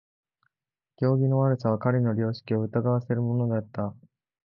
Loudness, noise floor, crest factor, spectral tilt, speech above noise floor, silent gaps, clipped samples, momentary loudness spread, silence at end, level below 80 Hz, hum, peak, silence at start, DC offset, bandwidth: -26 LUFS; under -90 dBFS; 18 dB; -11 dB/octave; over 65 dB; none; under 0.1%; 7 LU; 0.5 s; -62 dBFS; none; -8 dBFS; 1 s; under 0.1%; 5.6 kHz